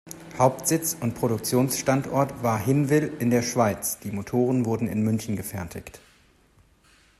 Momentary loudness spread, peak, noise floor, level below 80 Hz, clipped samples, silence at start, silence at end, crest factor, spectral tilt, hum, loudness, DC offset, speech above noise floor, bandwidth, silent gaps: 10 LU; -6 dBFS; -59 dBFS; -56 dBFS; under 0.1%; 0.05 s; 1.25 s; 20 dB; -5.5 dB/octave; none; -25 LUFS; under 0.1%; 35 dB; 13.5 kHz; none